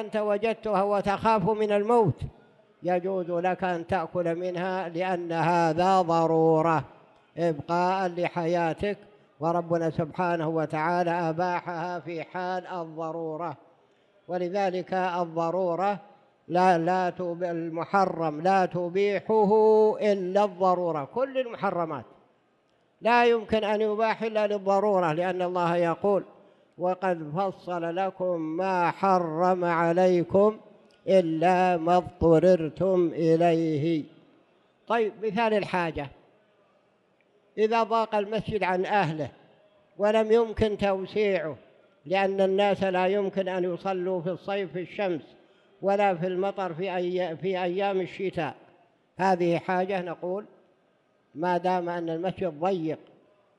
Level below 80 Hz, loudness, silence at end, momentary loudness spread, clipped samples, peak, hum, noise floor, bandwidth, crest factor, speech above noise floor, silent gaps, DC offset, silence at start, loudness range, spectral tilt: -58 dBFS; -26 LUFS; 0.6 s; 10 LU; under 0.1%; -10 dBFS; none; -67 dBFS; 10.5 kHz; 16 dB; 42 dB; none; under 0.1%; 0 s; 6 LU; -7 dB/octave